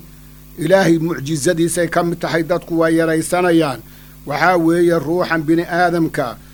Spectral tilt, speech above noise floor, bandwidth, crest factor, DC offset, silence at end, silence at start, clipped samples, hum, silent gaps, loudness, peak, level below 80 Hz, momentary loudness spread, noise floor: -5.5 dB/octave; 24 dB; over 20 kHz; 16 dB; under 0.1%; 0.1 s; 0.05 s; under 0.1%; none; none; -16 LUFS; 0 dBFS; -44 dBFS; 7 LU; -40 dBFS